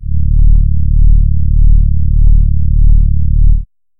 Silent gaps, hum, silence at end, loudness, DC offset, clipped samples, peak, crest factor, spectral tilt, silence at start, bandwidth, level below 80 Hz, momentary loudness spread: none; none; 0.35 s; -13 LUFS; under 0.1%; 0.5%; 0 dBFS; 6 dB; -16 dB/octave; 0 s; 0.3 kHz; -8 dBFS; 2 LU